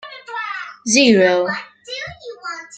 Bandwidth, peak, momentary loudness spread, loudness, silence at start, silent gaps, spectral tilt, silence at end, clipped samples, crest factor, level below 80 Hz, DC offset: 9.2 kHz; -2 dBFS; 18 LU; -16 LUFS; 0.05 s; none; -3 dB/octave; 0 s; under 0.1%; 18 dB; -60 dBFS; under 0.1%